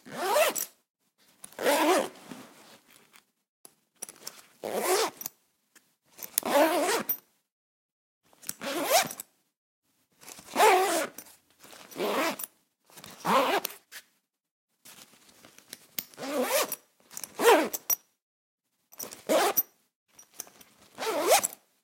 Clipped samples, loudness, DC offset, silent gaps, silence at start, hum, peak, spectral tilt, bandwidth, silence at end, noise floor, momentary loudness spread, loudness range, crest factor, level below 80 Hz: under 0.1%; -27 LUFS; under 0.1%; 0.90-0.94 s, 3.49-3.64 s, 7.52-8.21 s, 9.57-9.82 s, 14.51-14.68 s, 18.22-18.58 s, 19.96-20.06 s; 0.05 s; none; -2 dBFS; -1.5 dB/octave; 17 kHz; 0.3 s; -73 dBFS; 23 LU; 7 LU; 28 dB; -82 dBFS